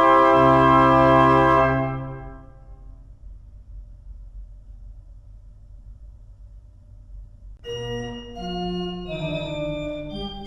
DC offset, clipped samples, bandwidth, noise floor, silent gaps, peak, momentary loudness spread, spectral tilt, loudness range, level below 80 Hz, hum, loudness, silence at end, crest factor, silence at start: under 0.1%; under 0.1%; 9.2 kHz; -45 dBFS; none; -4 dBFS; 19 LU; -7.5 dB/octave; 27 LU; -40 dBFS; none; -19 LUFS; 0 s; 18 dB; 0 s